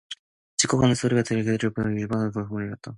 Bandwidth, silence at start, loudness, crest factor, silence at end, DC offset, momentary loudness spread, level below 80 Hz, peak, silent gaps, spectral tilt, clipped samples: 11.5 kHz; 0.1 s; -24 LUFS; 20 dB; 0 s; under 0.1%; 11 LU; -54 dBFS; -4 dBFS; 0.19-0.58 s; -5 dB/octave; under 0.1%